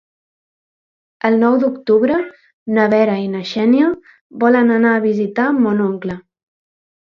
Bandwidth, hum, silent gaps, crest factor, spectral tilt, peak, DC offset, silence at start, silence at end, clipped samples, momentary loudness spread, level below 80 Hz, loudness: 6.6 kHz; none; 2.53-2.66 s, 4.21-4.30 s; 16 dB; -7.5 dB/octave; 0 dBFS; under 0.1%; 1.25 s; 0.9 s; under 0.1%; 12 LU; -60 dBFS; -15 LUFS